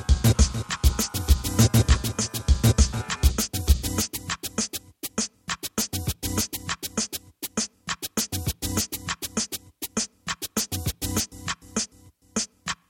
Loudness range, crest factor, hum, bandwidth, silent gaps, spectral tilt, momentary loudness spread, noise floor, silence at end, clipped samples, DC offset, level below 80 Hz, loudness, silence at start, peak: 6 LU; 20 dB; none; 17 kHz; none; -4 dB/octave; 10 LU; -55 dBFS; 0.15 s; under 0.1%; under 0.1%; -30 dBFS; -26 LUFS; 0 s; -6 dBFS